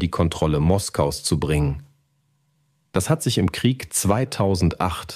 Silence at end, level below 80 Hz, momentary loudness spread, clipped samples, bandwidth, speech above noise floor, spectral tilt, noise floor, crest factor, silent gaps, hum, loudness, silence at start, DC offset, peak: 0 s; -38 dBFS; 6 LU; under 0.1%; 15.5 kHz; 45 dB; -5.5 dB/octave; -66 dBFS; 16 dB; none; none; -22 LUFS; 0 s; under 0.1%; -6 dBFS